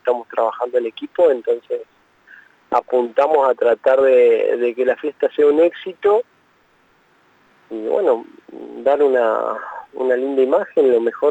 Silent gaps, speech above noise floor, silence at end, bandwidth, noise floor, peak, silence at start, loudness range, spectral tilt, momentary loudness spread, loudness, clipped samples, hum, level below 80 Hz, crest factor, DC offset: none; 41 dB; 0 s; 8 kHz; -57 dBFS; -4 dBFS; 0.05 s; 5 LU; -5.5 dB/octave; 11 LU; -17 LUFS; under 0.1%; none; -68 dBFS; 14 dB; under 0.1%